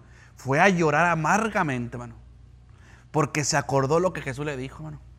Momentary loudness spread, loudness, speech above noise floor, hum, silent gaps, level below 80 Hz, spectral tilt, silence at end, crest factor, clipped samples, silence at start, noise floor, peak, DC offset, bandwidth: 17 LU; -24 LUFS; 26 dB; none; none; -50 dBFS; -5 dB/octave; 0.05 s; 22 dB; under 0.1%; 0.4 s; -50 dBFS; -4 dBFS; under 0.1%; 15 kHz